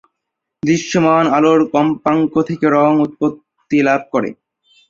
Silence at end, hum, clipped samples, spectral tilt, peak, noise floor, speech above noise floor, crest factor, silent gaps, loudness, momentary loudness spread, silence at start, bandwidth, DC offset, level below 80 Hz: 0.55 s; none; under 0.1%; -6 dB/octave; -2 dBFS; -78 dBFS; 64 dB; 14 dB; none; -15 LUFS; 8 LU; 0.65 s; 7.6 kHz; under 0.1%; -56 dBFS